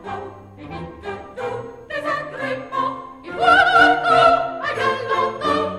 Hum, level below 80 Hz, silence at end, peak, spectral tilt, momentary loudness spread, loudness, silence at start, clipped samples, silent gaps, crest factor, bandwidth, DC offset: none; -50 dBFS; 0 s; -2 dBFS; -4.5 dB/octave; 20 LU; -18 LUFS; 0 s; under 0.1%; none; 18 dB; 11.5 kHz; under 0.1%